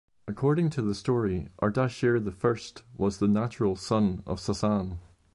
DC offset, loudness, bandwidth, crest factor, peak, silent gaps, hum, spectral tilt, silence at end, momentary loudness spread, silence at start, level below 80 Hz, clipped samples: under 0.1%; -28 LUFS; 11.5 kHz; 14 dB; -14 dBFS; none; none; -7 dB/octave; 0.35 s; 8 LU; 0.25 s; -48 dBFS; under 0.1%